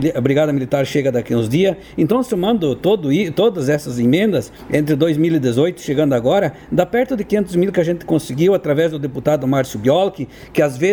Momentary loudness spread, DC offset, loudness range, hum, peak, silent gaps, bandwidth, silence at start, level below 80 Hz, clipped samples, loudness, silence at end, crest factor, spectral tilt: 4 LU; under 0.1%; 1 LU; none; 0 dBFS; none; over 20 kHz; 0 s; -48 dBFS; under 0.1%; -17 LUFS; 0 s; 16 dB; -6.5 dB/octave